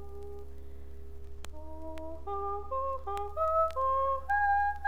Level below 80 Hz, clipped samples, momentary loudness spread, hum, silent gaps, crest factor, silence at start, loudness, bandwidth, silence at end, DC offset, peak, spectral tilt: -48 dBFS; under 0.1%; 21 LU; none; none; 14 dB; 0 s; -31 LUFS; 16 kHz; 0 s; 0.9%; -18 dBFS; -6 dB/octave